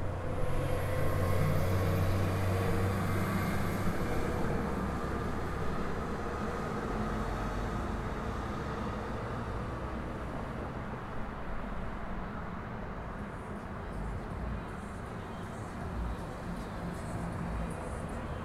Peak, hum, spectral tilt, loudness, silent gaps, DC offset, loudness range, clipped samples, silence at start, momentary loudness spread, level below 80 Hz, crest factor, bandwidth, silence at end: -16 dBFS; none; -7 dB/octave; -36 LUFS; none; under 0.1%; 9 LU; under 0.1%; 0 s; 10 LU; -42 dBFS; 18 dB; 14.5 kHz; 0 s